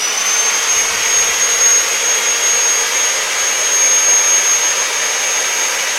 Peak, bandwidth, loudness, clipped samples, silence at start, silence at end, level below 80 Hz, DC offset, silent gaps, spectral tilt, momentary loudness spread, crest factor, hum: 0 dBFS; 16 kHz; -11 LUFS; under 0.1%; 0 s; 0 s; -54 dBFS; under 0.1%; none; 3 dB/octave; 5 LU; 14 dB; none